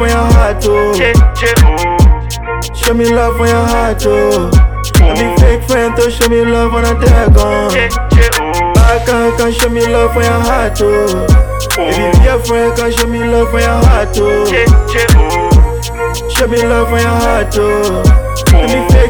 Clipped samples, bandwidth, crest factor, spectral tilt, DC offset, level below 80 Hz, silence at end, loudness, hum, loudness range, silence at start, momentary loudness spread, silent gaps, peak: 0.5%; over 20 kHz; 8 dB; -5.5 dB/octave; 0.8%; -12 dBFS; 0 s; -10 LUFS; none; 1 LU; 0 s; 4 LU; none; 0 dBFS